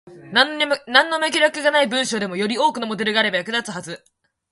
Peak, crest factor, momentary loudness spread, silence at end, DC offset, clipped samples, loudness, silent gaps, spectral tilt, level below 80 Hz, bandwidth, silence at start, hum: 0 dBFS; 20 dB; 9 LU; 0.55 s; under 0.1%; under 0.1%; -19 LUFS; none; -2.5 dB/octave; -68 dBFS; 11.5 kHz; 0.05 s; none